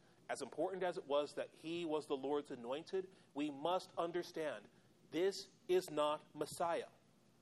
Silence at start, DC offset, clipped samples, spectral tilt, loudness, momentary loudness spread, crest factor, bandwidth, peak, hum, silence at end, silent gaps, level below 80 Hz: 0.3 s; under 0.1%; under 0.1%; -4.5 dB/octave; -42 LUFS; 8 LU; 18 dB; 13.5 kHz; -24 dBFS; none; 0.55 s; none; -86 dBFS